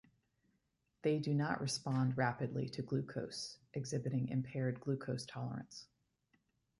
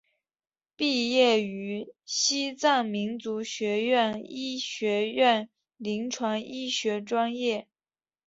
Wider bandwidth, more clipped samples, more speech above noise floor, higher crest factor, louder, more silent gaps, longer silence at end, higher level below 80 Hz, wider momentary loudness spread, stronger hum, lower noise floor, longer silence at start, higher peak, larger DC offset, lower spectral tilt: first, 11.5 kHz vs 8 kHz; neither; second, 43 dB vs over 63 dB; about the same, 18 dB vs 20 dB; second, -39 LUFS vs -27 LUFS; neither; first, 0.95 s vs 0.65 s; about the same, -72 dBFS vs -74 dBFS; about the same, 9 LU vs 11 LU; neither; second, -82 dBFS vs under -90 dBFS; first, 1.05 s vs 0.8 s; second, -22 dBFS vs -10 dBFS; neither; first, -6 dB/octave vs -3 dB/octave